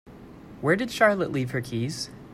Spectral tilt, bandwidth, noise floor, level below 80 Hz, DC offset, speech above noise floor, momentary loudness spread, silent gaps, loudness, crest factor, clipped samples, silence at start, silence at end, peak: -5.5 dB/octave; 16 kHz; -45 dBFS; -56 dBFS; under 0.1%; 20 dB; 11 LU; none; -25 LUFS; 20 dB; under 0.1%; 0.05 s; 0 s; -6 dBFS